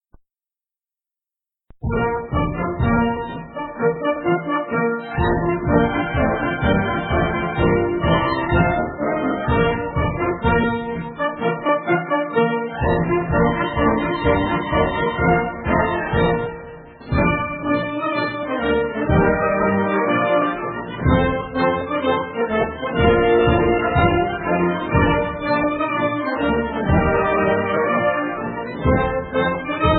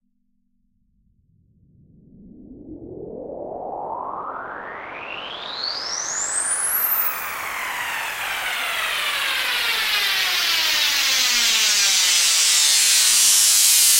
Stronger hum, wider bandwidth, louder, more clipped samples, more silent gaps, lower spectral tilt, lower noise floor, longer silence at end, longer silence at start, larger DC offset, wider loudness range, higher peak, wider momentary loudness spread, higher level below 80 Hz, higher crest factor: neither; second, 4.5 kHz vs 16 kHz; second, -20 LUFS vs -17 LUFS; neither; neither; first, -12 dB/octave vs 2.5 dB/octave; first, under -90 dBFS vs -66 dBFS; about the same, 0 s vs 0 s; second, 1.8 s vs 2.2 s; neither; second, 3 LU vs 19 LU; about the same, -2 dBFS vs -2 dBFS; second, 5 LU vs 19 LU; first, -32 dBFS vs -58 dBFS; about the same, 18 dB vs 18 dB